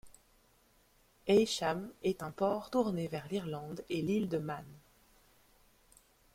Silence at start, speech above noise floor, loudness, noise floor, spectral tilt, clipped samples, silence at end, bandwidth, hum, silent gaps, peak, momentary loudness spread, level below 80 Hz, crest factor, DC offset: 0.05 s; 34 dB; -35 LUFS; -68 dBFS; -5.5 dB/octave; under 0.1%; 1.55 s; 16.5 kHz; none; none; -16 dBFS; 13 LU; -68 dBFS; 20 dB; under 0.1%